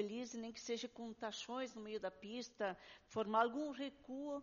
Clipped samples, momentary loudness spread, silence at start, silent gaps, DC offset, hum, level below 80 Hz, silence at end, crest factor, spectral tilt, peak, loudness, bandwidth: under 0.1%; 12 LU; 0 s; none; under 0.1%; none; -78 dBFS; 0 s; 22 dB; -2.5 dB/octave; -22 dBFS; -44 LUFS; 7.2 kHz